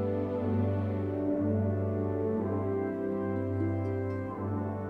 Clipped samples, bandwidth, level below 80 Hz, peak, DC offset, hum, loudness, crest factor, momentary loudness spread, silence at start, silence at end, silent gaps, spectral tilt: under 0.1%; 3.7 kHz; -62 dBFS; -18 dBFS; under 0.1%; none; -32 LUFS; 12 dB; 4 LU; 0 s; 0 s; none; -11 dB/octave